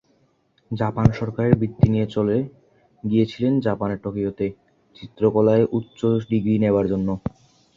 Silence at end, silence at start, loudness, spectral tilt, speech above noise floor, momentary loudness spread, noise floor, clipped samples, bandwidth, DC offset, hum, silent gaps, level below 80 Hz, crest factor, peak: 0.45 s; 0.7 s; -21 LUFS; -9.5 dB/octave; 43 dB; 10 LU; -63 dBFS; under 0.1%; 7.4 kHz; under 0.1%; none; none; -44 dBFS; 20 dB; -2 dBFS